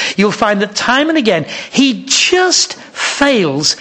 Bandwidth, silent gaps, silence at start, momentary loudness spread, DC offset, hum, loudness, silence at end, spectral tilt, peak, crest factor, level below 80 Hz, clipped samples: 10.5 kHz; none; 0 s; 8 LU; under 0.1%; none; -12 LUFS; 0 s; -2.5 dB/octave; 0 dBFS; 12 dB; -50 dBFS; under 0.1%